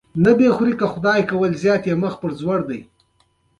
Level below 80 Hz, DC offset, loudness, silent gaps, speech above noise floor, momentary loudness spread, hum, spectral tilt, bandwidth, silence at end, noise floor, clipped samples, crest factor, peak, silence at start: -52 dBFS; under 0.1%; -18 LUFS; none; 45 dB; 10 LU; none; -7.5 dB/octave; 11 kHz; 0.75 s; -62 dBFS; under 0.1%; 16 dB; -2 dBFS; 0.15 s